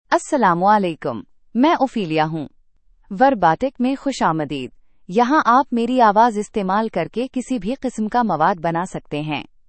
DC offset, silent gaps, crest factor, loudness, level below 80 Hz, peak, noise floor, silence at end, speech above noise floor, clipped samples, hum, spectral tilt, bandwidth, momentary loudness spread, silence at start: under 0.1%; none; 18 dB; -19 LUFS; -50 dBFS; -2 dBFS; -53 dBFS; 0.25 s; 35 dB; under 0.1%; none; -6 dB/octave; 8.8 kHz; 12 LU; 0.1 s